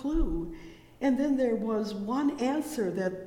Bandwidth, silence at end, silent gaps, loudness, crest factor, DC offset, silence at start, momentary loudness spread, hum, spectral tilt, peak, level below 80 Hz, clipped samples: 17 kHz; 0 s; none; -30 LUFS; 12 dB; under 0.1%; 0 s; 8 LU; none; -6.5 dB/octave; -16 dBFS; -40 dBFS; under 0.1%